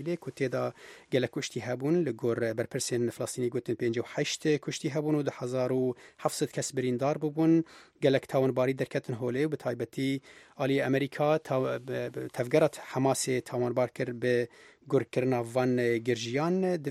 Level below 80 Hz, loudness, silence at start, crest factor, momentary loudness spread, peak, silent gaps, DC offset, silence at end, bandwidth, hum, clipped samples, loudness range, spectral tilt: -72 dBFS; -30 LUFS; 0 s; 18 dB; 7 LU; -10 dBFS; none; under 0.1%; 0 s; 15 kHz; none; under 0.1%; 2 LU; -5.5 dB/octave